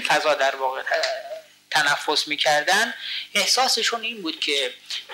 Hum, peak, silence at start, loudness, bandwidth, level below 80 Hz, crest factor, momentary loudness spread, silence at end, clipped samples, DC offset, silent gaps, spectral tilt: 50 Hz at -60 dBFS; -6 dBFS; 0 s; -21 LUFS; 16 kHz; -86 dBFS; 16 dB; 10 LU; 0 s; under 0.1%; under 0.1%; none; -0.5 dB/octave